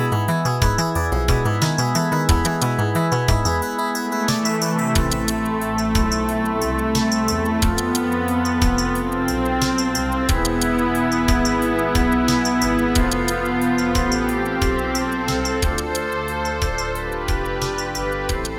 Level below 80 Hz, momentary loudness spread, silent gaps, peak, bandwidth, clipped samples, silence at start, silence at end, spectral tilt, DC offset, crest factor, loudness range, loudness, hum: -28 dBFS; 5 LU; none; -4 dBFS; 19.5 kHz; under 0.1%; 0 s; 0 s; -5 dB/octave; under 0.1%; 16 dB; 3 LU; -20 LUFS; none